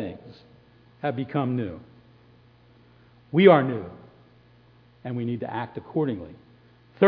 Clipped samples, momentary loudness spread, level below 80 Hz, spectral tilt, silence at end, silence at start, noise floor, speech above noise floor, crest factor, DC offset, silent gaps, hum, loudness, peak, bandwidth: under 0.1%; 25 LU; -64 dBFS; -10.5 dB/octave; 0 s; 0 s; -56 dBFS; 32 dB; 24 dB; under 0.1%; none; 60 Hz at -50 dBFS; -25 LUFS; -2 dBFS; 5.2 kHz